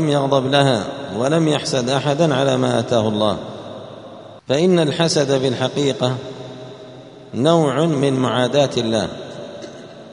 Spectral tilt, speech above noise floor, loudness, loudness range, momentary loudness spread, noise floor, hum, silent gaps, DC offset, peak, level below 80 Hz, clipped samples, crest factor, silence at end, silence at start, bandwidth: -5.5 dB/octave; 21 dB; -18 LUFS; 2 LU; 19 LU; -38 dBFS; none; none; under 0.1%; 0 dBFS; -56 dBFS; under 0.1%; 18 dB; 0 s; 0 s; 10.5 kHz